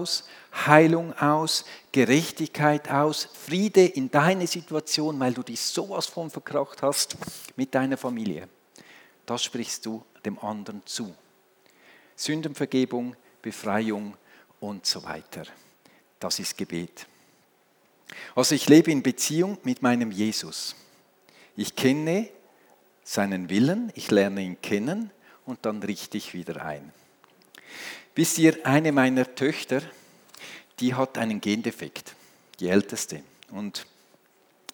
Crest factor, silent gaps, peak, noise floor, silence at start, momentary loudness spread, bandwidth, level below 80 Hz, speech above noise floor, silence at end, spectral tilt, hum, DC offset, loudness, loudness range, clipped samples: 26 dB; none; 0 dBFS; -63 dBFS; 0 s; 18 LU; over 20 kHz; -78 dBFS; 38 dB; 0.9 s; -4.5 dB/octave; none; under 0.1%; -25 LUFS; 10 LU; under 0.1%